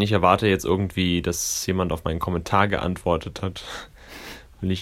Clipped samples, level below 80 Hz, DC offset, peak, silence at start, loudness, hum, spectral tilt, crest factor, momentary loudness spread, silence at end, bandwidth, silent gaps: under 0.1%; -42 dBFS; under 0.1%; -2 dBFS; 0 s; -23 LUFS; none; -4.5 dB/octave; 20 dB; 19 LU; 0 s; 16 kHz; none